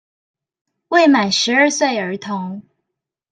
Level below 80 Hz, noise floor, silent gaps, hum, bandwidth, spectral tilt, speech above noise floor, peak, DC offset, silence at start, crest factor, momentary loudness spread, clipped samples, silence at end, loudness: -66 dBFS; -80 dBFS; none; none; 9.6 kHz; -3 dB/octave; 65 dB; -2 dBFS; under 0.1%; 0.9 s; 16 dB; 13 LU; under 0.1%; 0.7 s; -16 LUFS